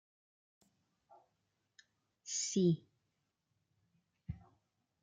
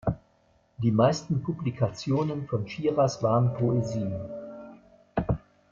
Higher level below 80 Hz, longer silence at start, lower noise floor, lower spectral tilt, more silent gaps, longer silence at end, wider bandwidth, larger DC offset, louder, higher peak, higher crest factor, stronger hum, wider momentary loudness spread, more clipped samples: second, -70 dBFS vs -50 dBFS; first, 2.25 s vs 0.05 s; first, -85 dBFS vs -65 dBFS; second, -5 dB/octave vs -7.5 dB/octave; neither; first, 0.65 s vs 0.35 s; first, 9.6 kHz vs 7.4 kHz; neither; second, -36 LUFS vs -28 LUFS; second, -20 dBFS vs -10 dBFS; about the same, 22 dB vs 18 dB; neither; first, 21 LU vs 13 LU; neither